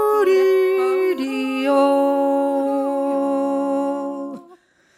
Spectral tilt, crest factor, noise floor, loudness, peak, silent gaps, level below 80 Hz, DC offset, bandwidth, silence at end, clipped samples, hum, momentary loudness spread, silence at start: -4.5 dB/octave; 12 dB; -51 dBFS; -19 LUFS; -6 dBFS; none; -82 dBFS; under 0.1%; 14.5 kHz; 0.45 s; under 0.1%; none; 10 LU; 0 s